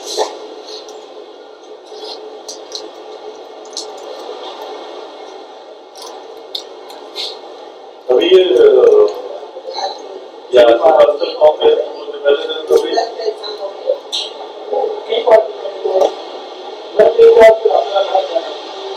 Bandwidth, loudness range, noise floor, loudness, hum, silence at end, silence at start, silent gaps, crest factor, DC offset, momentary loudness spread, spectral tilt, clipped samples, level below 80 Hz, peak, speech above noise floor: 12.5 kHz; 18 LU; -35 dBFS; -12 LUFS; none; 0 s; 0 s; none; 14 dB; under 0.1%; 24 LU; -3 dB/octave; 0.4%; -56 dBFS; 0 dBFS; 26 dB